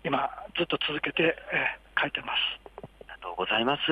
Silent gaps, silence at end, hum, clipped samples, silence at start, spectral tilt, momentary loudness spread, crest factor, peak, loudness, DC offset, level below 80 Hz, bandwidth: none; 0 s; none; under 0.1%; 0.05 s; -6 dB/octave; 16 LU; 18 dB; -10 dBFS; -28 LUFS; under 0.1%; -58 dBFS; 11.5 kHz